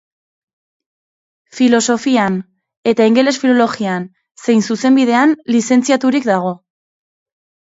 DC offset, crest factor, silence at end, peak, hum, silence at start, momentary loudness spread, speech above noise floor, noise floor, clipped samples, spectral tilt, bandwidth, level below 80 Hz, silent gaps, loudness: under 0.1%; 16 dB; 1.1 s; 0 dBFS; none; 1.55 s; 11 LU; over 77 dB; under -90 dBFS; under 0.1%; -4.5 dB/octave; 8 kHz; -64 dBFS; 2.77-2.83 s; -14 LUFS